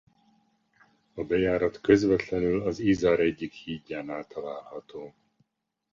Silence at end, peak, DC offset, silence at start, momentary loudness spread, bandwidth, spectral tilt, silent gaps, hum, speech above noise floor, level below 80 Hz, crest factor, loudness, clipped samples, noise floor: 0.85 s; -6 dBFS; under 0.1%; 1.15 s; 19 LU; 7.4 kHz; -6.5 dB/octave; none; none; 55 dB; -54 dBFS; 22 dB; -27 LUFS; under 0.1%; -81 dBFS